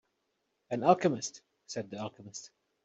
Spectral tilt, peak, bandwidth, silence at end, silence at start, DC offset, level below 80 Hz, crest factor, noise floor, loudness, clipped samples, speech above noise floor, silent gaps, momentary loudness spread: -5 dB/octave; -10 dBFS; 8.2 kHz; 0.4 s; 0.7 s; under 0.1%; -76 dBFS; 26 dB; -80 dBFS; -32 LUFS; under 0.1%; 49 dB; none; 19 LU